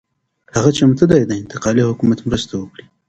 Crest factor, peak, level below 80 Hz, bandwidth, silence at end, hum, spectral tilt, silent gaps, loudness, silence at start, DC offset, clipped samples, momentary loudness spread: 16 dB; 0 dBFS; -42 dBFS; 8.8 kHz; 0.4 s; none; -6 dB/octave; none; -16 LUFS; 0.55 s; under 0.1%; under 0.1%; 12 LU